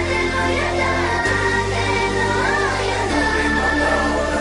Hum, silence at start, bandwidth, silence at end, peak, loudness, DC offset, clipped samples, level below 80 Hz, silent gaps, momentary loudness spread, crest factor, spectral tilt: none; 0 s; 11 kHz; 0 s; -6 dBFS; -18 LUFS; under 0.1%; under 0.1%; -32 dBFS; none; 2 LU; 12 dB; -4.5 dB/octave